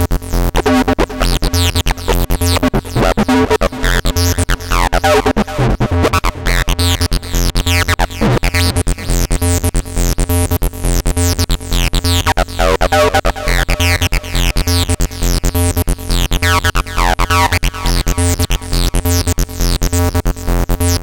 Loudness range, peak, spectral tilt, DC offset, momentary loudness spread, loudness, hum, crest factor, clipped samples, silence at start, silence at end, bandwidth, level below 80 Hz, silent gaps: 2 LU; -2 dBFS; -4.5 dB/octave; 0.8%; 5 LU; -14 LUFS; none; 12 dB; under 0.1%; 0 s; 0 s; 17.5 kHz; -18 dBFS; none